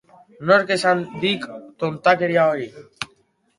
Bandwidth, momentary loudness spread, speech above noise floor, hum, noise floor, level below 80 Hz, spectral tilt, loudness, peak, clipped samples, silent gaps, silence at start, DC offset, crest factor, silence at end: 11.5 kHz; 16 LU; 42 dB; none; -61 dBFS; -64 dBFS; -5 dB/octave; -20 LUFS; -2 dBFS; under 0.1%; none; 0.4 s; under 0.1%; 20 dB; 0.55 s